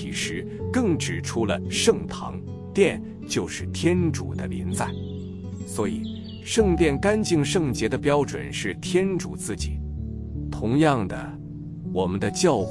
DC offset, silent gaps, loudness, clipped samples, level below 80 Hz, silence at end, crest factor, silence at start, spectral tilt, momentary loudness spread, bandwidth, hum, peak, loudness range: under 0.1%; none; -25 LUFS; under 0.1%; -42 dBFS; 0 s; 18 dB; 0 s; -5 dB/octave; 13 LU; 12 kHz; none; -6 dBFS; 4 LU